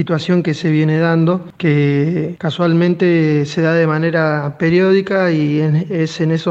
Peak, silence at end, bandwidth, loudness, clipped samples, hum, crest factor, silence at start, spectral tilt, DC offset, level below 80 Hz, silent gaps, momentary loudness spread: -2 dBFS; 0 s; 7.6 kHz; -15 LUFS; under 0.1%; none; 14 dB; 0 s; -8 dB/octave; under 0.1%; -56 dBFS; none; 4 LU